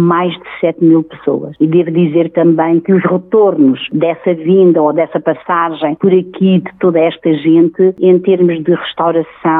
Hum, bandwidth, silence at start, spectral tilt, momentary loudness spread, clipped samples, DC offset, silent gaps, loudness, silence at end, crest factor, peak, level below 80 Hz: none; 4 kHz; 0 s; -11.5 dB/octave; 6 LU; under 0.1%; under 0.1%; none; -11 LUFS; 0 s; 10 dB; 0 dBFS; -60 dBFS